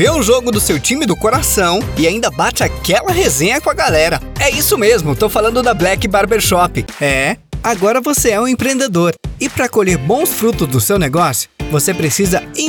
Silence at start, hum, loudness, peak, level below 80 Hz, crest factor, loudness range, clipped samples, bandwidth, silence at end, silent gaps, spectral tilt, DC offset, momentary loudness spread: 0 s; none; -13 LUFS; 0 dBFS; -30 dBFS; 14 dB; 2 LU; under 0.1%; over 20 kHz; 0 s; none; -4 dB/octave; under 0.1%; 4 LU